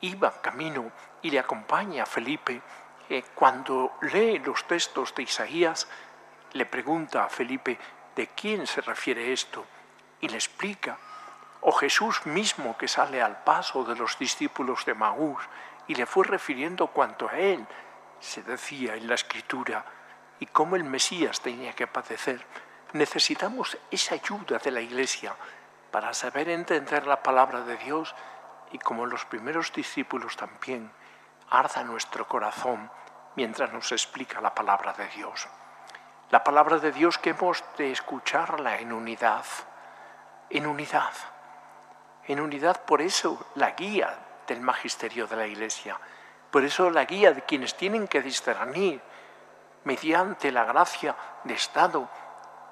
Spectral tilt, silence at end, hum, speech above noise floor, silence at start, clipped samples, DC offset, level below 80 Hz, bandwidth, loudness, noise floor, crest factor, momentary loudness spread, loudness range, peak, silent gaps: -2.5 dB/octave; 0 s; none; 26 dB; 0 s; under 0.1%; under 0.1%; -86 dBFS; 14.5 kHz; -27 LUFS; -53 dBFS; 24 dB; 16 LU; 5 LU; -4 dBFS; none